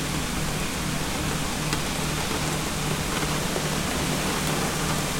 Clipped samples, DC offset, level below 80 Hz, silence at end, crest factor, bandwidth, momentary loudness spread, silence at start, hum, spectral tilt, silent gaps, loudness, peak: under 0.1%; under 0.1%; -38 dBFS; 0 s; 20 dB; 16.5 kHz; 2 LU; 0 s; none; -3.5 dB/octave; none; -26 LUFS; -6 dBFS